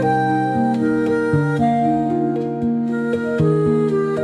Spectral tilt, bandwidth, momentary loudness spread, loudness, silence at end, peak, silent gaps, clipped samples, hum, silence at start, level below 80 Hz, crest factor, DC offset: -8.5 dB/octave; 10 kHz; 4 LU; -18 LUFS; 0 s; -6 dBFS; none; under 0.1%; none; 0 s; -52 dBFS; 12 dB; under 0.1%